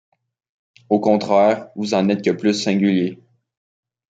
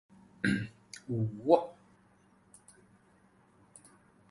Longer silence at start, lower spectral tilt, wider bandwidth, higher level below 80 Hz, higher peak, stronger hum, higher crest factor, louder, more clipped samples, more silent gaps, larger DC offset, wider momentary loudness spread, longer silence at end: first, 0.9 s vs 0.45 s; about the same, -6 dB/octave vs -6.5 dB/octave; second, 7.8 kHz vs 11.5 kHz; about the same, -68 dBFS vs -68 dBFS; first, -2 dBFS vs -8 dBFS; neither; second, 18 dB vs 28 dB; first, -18 LUFS vs -32 LUFS; neither; neither; neither; second, 6 LU vs 18 LU; second, 1 s vs 2.6 s